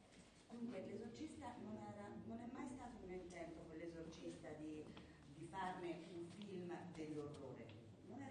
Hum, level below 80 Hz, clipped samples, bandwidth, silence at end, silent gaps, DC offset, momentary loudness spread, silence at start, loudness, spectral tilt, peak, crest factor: none; -74 dBFS; under 0.1%; 9.6 kHz; 0 s; none; under 0.1%; 8 LU; 0 s; -54 LUFS; -6 dB/octave; -36 dBFS; 18 dB